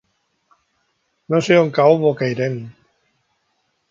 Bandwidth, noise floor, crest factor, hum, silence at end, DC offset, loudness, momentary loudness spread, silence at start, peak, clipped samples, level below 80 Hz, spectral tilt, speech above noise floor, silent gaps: 7.6 kHz; -68 dBFS; 20 dB; none; 1.2 s; under 0.1%; -17 LUFS; 13 LU; 1.3 s; 0 dBFS; under 0.1%; -64 dBFS; -6.5 dB/octave; 52 dB; none